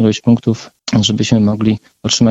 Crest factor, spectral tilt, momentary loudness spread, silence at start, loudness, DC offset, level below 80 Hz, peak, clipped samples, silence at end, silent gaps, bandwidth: 12 dB; -5 dB/octave; 7 LU; 0 s; -14 LUFS; under 0.1%; -44 dBFS; 0 dBFS; under 0.1%; 0 s; none; 8 kHz